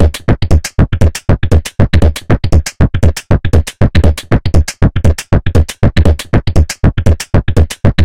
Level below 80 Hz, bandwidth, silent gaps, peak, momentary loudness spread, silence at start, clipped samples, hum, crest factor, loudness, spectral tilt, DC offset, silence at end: -14 dBFS; 15.5 kHz; none; 0 dBFS; 3 LU; 0 s; 0.2%; none; 8 dB; -12 LUFS; -6.5 dB/octave; 10%; 0 s